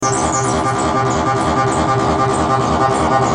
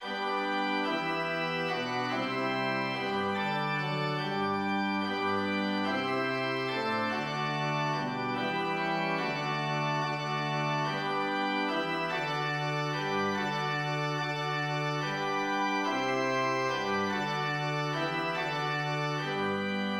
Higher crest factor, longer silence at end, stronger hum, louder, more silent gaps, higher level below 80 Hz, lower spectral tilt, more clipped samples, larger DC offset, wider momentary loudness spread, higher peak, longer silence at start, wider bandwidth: about the same, 14 dB vs 14 dB; about the same, 0 s vs 0 s; neither; first, -15 LUFS vs -31 LUFS; neither; first, -36 dBFS vs -72 dBFS; about the same, -5 dB/octave vs -5 dB/octave; neither; neither; about the same, 2 LU vs 2 LU; first, -2 dBFS vs -18 dBFS; about the same, 0 s vs 0 s; second, 10.5 kHz vs 17 kHz